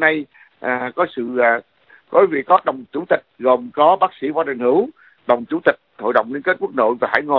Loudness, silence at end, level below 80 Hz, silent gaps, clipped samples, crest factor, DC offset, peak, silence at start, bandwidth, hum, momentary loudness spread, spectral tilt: -18 LUFS; 0 s; -66 dBFS; none; under 0.1%; 18 dB; under 0.1%; 0 dBFS; 0 s; 5.4 kHz; none; 9 LU; -8 dB/octave